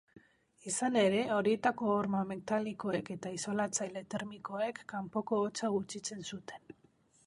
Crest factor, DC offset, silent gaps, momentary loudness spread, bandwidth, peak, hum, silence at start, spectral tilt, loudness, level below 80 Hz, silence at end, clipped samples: 22 dB; under 0.1%; none; 12 LU; 11.5 kHz; -14 dBFS; none; 0.15 s; -4.5 dB/octave; -35 LUFS; -74 dBFS; 0.55 s; under 0.1%